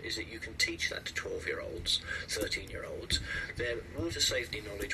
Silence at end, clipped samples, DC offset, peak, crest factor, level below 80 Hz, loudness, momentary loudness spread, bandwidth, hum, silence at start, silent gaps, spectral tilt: 0 s; under 0.1%; under 0.1%; -16 dBFS; 20 dB; -50 dBFS; -34 LUFS; 8 LU; 13.5 kHz; none; 0 s; none; -2.5 dB/octave